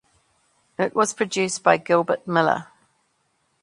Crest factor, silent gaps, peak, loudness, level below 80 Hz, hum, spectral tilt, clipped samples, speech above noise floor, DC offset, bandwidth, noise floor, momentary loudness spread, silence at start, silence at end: 22 dB; none; 0 dBFS; -21 LUFS; -68 dBFS; none; -4 dB/octave; under 0.1%; 48 dB; under 0.1%; 11.5 kHz; -69 dBFS; 7 LU; 0.8 s; 1 s